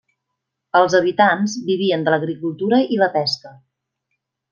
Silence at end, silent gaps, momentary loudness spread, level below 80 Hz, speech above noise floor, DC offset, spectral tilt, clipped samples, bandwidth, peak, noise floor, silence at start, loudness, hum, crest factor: 1 s; none; 8 LU; -68 dBFS; 61 dB; under 0.1%; -5 dB/octave; under 0.1%; 7.2 kHz; -2 dBFS; -79 dBFS; 0.75 s; -18 LUFS; none; 18 dB